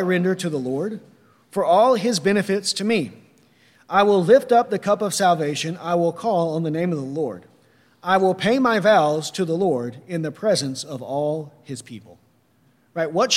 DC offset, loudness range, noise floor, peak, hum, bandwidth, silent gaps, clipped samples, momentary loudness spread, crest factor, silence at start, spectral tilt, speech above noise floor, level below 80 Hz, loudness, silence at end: under 0.1%; 6 LU; -60 dBFS; -4 dBFS; none; 16 kHz; none; under 0.1%; 14 LU; 18 dB; 0 s; -4.5 dB/octave; 40 dB; -70 dBFS; -21 LUFS; 0 s